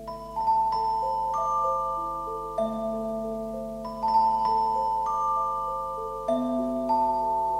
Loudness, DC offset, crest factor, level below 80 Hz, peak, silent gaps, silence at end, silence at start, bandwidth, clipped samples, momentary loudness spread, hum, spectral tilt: -27 LUFS; under 0.1%; 14 dB; -50 dBFS; -12 dBFS; none; 0 s; 0 s; 15.5 kHz; under 0.1%; 9 LU; 50 Hz at -50 dBFS; -6.5 dB/octave